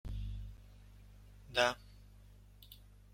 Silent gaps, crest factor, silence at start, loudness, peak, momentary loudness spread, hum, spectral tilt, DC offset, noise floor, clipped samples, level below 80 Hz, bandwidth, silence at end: none; 28 dB; 0.05 s; -37 LUFS; -16 dBFS; 27 LU; 50 Hz at -60 dBFS; -3.5 dB/octave; under 0.1%; -59 dBFS; under 0.1%; -52 dBFS; 16.5 kHz; 0.2 s